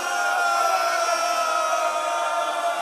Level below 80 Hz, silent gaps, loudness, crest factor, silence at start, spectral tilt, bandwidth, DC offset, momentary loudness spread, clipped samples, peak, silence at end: -86 dBFS; none; -22 LUFS; 14 dB; 0 s; 1 dB/octave; 14.5 kHz; under 0.1%; 3 LU; under 0.1%; -10 dBFS; 0 s